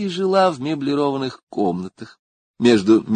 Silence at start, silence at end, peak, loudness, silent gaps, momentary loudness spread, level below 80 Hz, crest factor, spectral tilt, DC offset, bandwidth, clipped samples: 0 s; 0 s; -2 dBFS; -19 LUFS; 1.43-1.47 s, 2.19-2.54 s; 12 LU; -58 dBFS; 16 dB; -6 dB/octave; under 0.1%; 9.6 kHz; under 0.1%